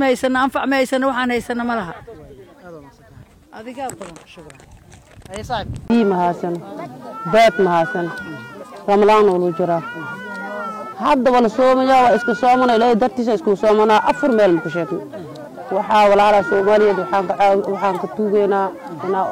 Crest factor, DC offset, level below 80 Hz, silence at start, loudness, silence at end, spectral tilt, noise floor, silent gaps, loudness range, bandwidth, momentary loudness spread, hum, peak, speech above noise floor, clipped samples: 10 dB; under 0.1%; -50 dBFS; 0 s; -16 LUFS; 0 s; -5.5 dB/octave; -44 dBFS; none; 12 LU; 16 kHz; 18 LU; none; -6 dBFS; 28 dB; under 0.1%